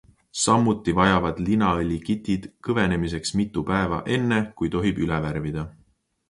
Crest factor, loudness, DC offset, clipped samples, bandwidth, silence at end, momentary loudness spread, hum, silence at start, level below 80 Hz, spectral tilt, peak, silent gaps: 20 dB; -23 LUFS; under 0.1%; under 0.1%; 11.5 kHz; 0.6 s; 9 LU; none; 0.35 s; -42 dBFS; -5.5 dB/octave; -4 dBFS; none